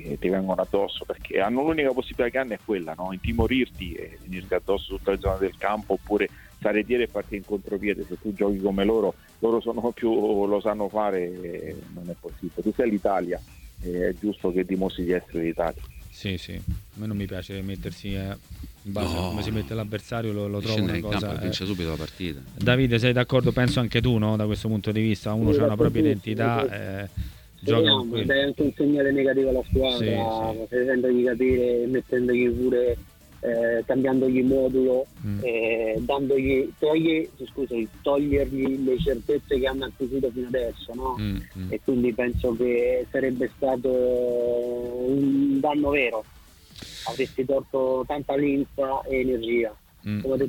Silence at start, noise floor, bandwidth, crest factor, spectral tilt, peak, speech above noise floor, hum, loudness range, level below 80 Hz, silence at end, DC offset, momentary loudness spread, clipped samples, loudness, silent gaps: 0 s; -46 dBFS; 19 kHz; 18 dB; -7 dB/octave; -6 dBFS; 21 dB; none; 6 LU; -42 dBFS; 0 s; under 0.1%; 11 LU; under 0.1%; -25 LUFS; none